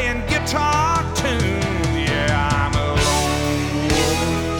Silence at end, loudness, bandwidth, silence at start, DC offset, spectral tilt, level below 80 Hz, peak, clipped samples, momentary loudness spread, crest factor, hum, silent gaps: 0 s; -19 LUFS; 19.5 kHz; 0 s; under 0.1%; -4.5 dB/octave; -30 dBFS; -6 dBFS; under 0.1%; 3 LU; 14 dB; none; none